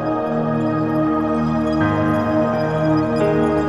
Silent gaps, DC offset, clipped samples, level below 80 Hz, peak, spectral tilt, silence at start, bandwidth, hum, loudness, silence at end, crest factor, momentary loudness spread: none; 0.4%; under 0.1%; -42 dBFS; -6 dBFS; -8.5 dB/octave; 0 s; 10.5 kHz; none; -18 LUFS; 0 s; 12 dB; 2 LU